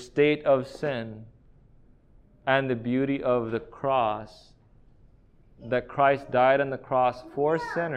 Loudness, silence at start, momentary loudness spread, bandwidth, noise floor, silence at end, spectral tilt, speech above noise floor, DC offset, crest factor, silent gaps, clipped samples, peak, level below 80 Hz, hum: -26 LUFS; 0 s; 12 LU; 9.6 kHz; -57 dBFS; 0 s; -7 dB/octave; 31 dB; under 0.1%; 20 dB; none; under 0.1%; -8 dBFS; -58 dBFS; none